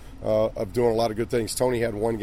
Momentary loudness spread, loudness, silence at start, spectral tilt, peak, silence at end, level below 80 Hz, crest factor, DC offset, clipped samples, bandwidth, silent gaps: 3 LU; -25 LUFS; 0 s; -5.5 dB/octave; -10 dBFS; 0 s; -44 dBFS; 14 dB; 0.4%; under 0.1%; 16 kHz; none